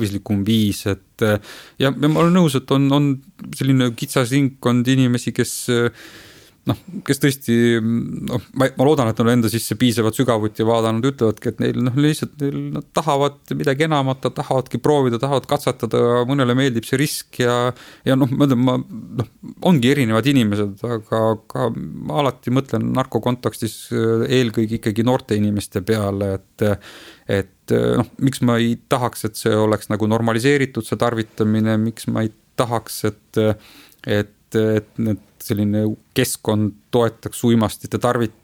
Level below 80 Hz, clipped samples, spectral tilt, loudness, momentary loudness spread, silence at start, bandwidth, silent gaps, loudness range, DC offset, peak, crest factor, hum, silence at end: -52 dBFS; under 0.1%; -6 dB/octave; -19 LUFS; 8 LU; 0 s; 18.5 kHz; none; 3 LU; under 0.1%; -2 dBFS; 18 dB; none; 0.15 s